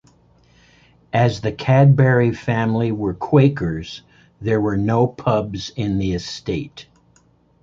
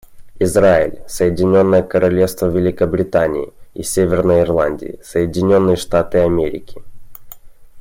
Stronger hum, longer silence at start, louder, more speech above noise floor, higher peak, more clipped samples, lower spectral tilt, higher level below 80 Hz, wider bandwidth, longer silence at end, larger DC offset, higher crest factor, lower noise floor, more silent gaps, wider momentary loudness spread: neither; first, 1.15 s vs 0.1 s; second, -19 LUFS vs -15 LUFS; first, 39 dB vs 21 dB; about the same, -2 dBFS vs -2 dBFS; neither; about the same, -7.5 dB/octave vs -6.5 dB/octave; about the same, -44 dBFS vs -40 dBFS; second, 7.4 kHz vs 16.5 kHz; first, 0.8 s vs 0 s; neither; about the same, 16 dB vs 14 dB; first, -56 dBFS vs -35 dBFS; neither; first, 13 LU vs 10 LU